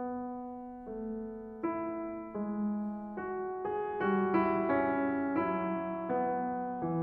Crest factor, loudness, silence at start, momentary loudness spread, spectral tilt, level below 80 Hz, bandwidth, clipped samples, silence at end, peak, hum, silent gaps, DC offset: 16 dB; -34 LUFS; 0 s; 11 LU; -7 dB/octave; -66 dBFS; 4.7 kHz; under 0.1%; 0 s; -16 dBFS; none; none; under 0.1%